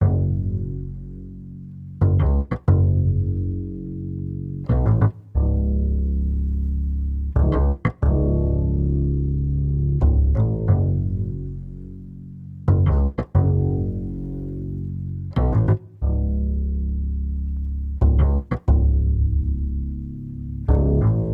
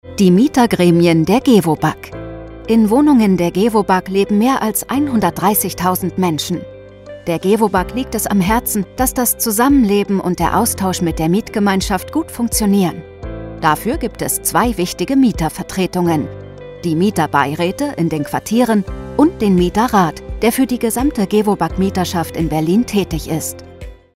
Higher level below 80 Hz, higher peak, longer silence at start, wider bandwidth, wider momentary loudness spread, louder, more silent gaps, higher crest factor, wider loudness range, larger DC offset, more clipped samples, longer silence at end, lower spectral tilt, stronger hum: first, -24 dBFS vs -34 dBFS; second, -4 dBFS vs 0 dBFS; about the same, 0 s vs 0.05 s; second, 3.3 kHz vs 16.5 kHz; first, 13 LU vs 10 LU; second, -22 LUFS vs -15 LUFS; neither; about the same, 16 dB vs 16 dB; about the same, 2 LU vs 4 LU; neither; neither; second, 0 s vs 0.2 s; first, -12 dB/octave vs -5.5 dB/octave; neither